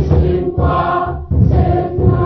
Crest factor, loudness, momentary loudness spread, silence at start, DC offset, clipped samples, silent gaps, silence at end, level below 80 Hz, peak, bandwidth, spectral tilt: 12 dB; -15 LUFS; 5 LU; 0 s; under 0.1%; under 0.1%; none; 0 s; -20 dBFS; 0 dBFS; 5.4 kHz; -11 dB/octave